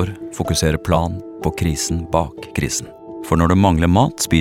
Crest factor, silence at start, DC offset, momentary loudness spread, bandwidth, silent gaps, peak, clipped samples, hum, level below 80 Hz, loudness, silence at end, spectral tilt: 18 dB; 0 s; under 0.1%; 11 LU; 16.5 kHz; none; 0 dBFS; under 0.1%; none; -32 dBFS; -18 LUFS; 0 s; -5 dB/octave